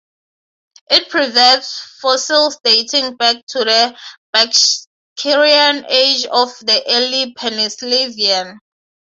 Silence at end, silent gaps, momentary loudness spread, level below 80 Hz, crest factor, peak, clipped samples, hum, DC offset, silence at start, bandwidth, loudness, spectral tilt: 0.6 s; 2.60-2.64 s, 3.43-3.47 s, 4.18-4.33 s, 4.87-5.16 s; 9 LU; -68 dBFS; 16 dB; 0 dBFS; under 0.1%; none; under 0.1%; 0.9 s; 8 kHz; -13 LUFS; 0 dB/octave